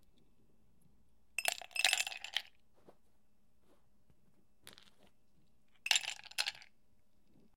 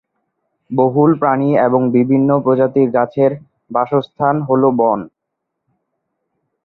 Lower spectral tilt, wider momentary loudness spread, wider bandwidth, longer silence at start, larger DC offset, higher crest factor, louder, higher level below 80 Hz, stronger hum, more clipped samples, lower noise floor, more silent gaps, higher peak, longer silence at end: second, 2.5 dB/octave vs -11.5 dB/octave; first, 11 LU vs 6 LU; first, 16.5 kHz vs 4.2 kHz; first, 1.4 s vs 0.7 s; neither; first, 34 dB vs 14 dB; second, -36 LUFS vs -15 LUFS; second, -80 dBFS vs -58 dBFS; neither; neither; about the same, -77 dBFS vs -77 dBFS; neither; second, -10 dBFS vs -2 dBFS; second, 0.95 s vs 1.55 s